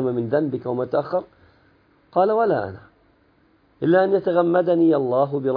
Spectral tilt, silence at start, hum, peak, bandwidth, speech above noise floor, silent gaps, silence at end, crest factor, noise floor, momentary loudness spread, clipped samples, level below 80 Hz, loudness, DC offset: -11 dB/octave; 0 s; none; -6 dBFS; 5 kHz; 40 dB; none; 0 s; 16 dB; -59 dBFS; 9 LU; under 0.1%; -64 dBFS; -20 LUFS; under 0.1%